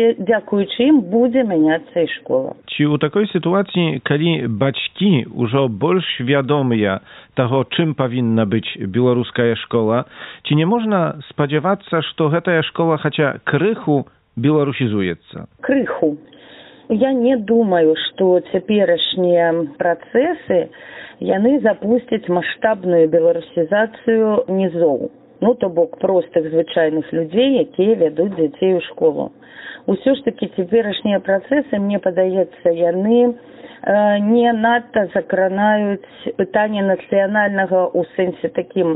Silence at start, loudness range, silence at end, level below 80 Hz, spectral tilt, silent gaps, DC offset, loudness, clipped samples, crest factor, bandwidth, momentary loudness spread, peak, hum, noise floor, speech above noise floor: 0 s; 2 LU; 0 s; -60 dBFS; -5 dB/octave; none; under 0.1%; -17 LUFS; under 0.1%; 16 dB; 4.1 kHz; 7 LU; -2 dBFS; none; -42 dBFS; 26 dB